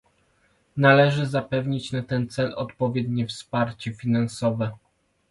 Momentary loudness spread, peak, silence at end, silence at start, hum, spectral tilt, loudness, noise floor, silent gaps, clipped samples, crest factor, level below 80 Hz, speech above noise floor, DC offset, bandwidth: 11 LU; -2 dBFS; 0.55 s; 0.75 s; none; -6.5 dB/octave; -24 LUFS; -65 dBFS; none; under 0.1%; 22 dB; -58 dBFS; 41 dB; under 0.1%; 11.5 kHz